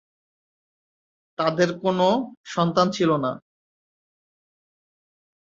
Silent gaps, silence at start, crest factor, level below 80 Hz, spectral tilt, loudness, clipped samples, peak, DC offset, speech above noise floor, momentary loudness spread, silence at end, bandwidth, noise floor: 2.37-2.44 s; 1.4 s; 22 dB; -66 dBFS; -6 dB/octave; -23 LUFS; under 0.1%; -4 dBFS; under 0.1%; over 68 dB; 9 LU; 2.2 s; 7.8 kHz; under -90 dBFS